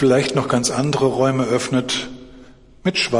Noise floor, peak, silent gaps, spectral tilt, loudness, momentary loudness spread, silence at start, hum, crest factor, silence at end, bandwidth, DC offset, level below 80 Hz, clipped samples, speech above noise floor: -44 dBFS; -4 dBFS; none; -4.5 dB/octave; -19 LUFS; 7 LU; 0 s; none; 16 dB; 0 s; 11.5 kHz; under 0.1%; -50 dBFS; under 0.1%; 26 dB